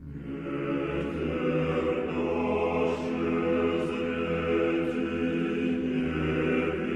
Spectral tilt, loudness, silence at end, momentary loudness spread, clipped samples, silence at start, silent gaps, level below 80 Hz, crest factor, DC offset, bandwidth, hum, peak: -7.5 dB/octave; -28 LUFS; 0 s; 4 LU; under 0.1%; 0 s; none; -50 dBFS; 12 dB; under 0.1%; 9.6 kHz; none; -16 dBFS